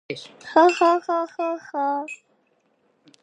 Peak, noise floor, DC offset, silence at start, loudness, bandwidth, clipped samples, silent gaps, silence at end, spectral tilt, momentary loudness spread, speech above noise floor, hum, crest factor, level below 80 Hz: -2 dBFS; -66 dBFS; under 0.1%; 0.1 s; -21 LUFS; 9.8 kHz; under 0.1%; none; 1.1 s; -4 dB/octave; 18 LU; 44 dB; none; 20 dB; -80 dBFS